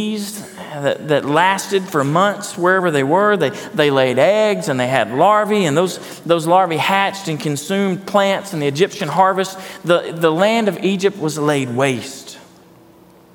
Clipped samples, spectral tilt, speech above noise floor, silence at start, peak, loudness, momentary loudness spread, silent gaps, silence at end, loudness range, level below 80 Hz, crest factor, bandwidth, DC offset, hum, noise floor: under 0.1%; -5 dB/octave; 30 dB; 0 s; 0 dBFS; -16 LUFS; 9 LU; none; 0.95 s; 3 LU; -66 dBFS; 16 dB; 18 kHz; under 0.1%; none; -46 dBFS